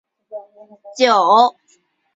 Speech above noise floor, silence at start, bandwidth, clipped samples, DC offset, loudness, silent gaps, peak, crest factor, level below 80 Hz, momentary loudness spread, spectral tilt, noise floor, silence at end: 44 dB; 0.3 s; 7.8 kHz; under 0.1%; under 0.1%; -14 LUFS; none; -2 dBFS; 16 dB; -70 dBFS; 24 LU; -3 dB/octave; -60 dBFS; 0.65 s